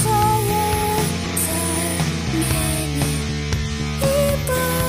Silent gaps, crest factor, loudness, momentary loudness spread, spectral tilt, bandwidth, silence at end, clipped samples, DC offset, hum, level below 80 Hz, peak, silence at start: none; 14 dB; -20 LUFS; 5 LU; -4.5 dB/octave; 16 kHz; 0 s; under 0.1%; under 0.1%; none; -32 dBFS; -6 dBFS; 0 s